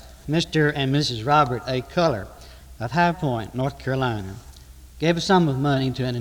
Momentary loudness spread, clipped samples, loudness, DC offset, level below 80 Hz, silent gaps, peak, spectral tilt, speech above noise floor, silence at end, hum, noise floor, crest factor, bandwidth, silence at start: 11 LU; under 0.1%; -22 LUFS; under 0.1%; -46 dBFS; none; -6 dBFS; -6 dB/octave; 22 dB; 0 s; none; -44 dBFS; 18 dB; 19 kHz; 0 s